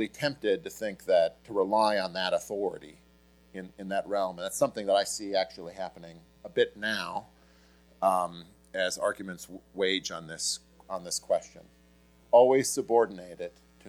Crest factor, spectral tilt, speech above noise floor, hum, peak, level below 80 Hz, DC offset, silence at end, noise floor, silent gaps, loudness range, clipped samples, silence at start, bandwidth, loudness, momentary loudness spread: 22 dB; -3 dB/octave; 31 dB; none; -8 dBFS; -66 dBFS; under 0.1%; 0 s; -60 dBFS; none; 5 LU; under 0.1%; 0 s; 19.5 kHz; -29 LUFS; 16 LU